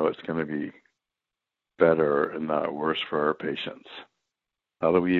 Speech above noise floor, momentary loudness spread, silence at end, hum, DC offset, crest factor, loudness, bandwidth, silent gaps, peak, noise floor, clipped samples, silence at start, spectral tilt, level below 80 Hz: 62 dB; 15 LU; 0 s; none; under 0.1%; 22 dB; -26 LUFS; 4.6 kHz; none; -6 dBFS; -88 dBFS; under 0.1%; 0 s; -8.5 dB/octave; -62 dBFS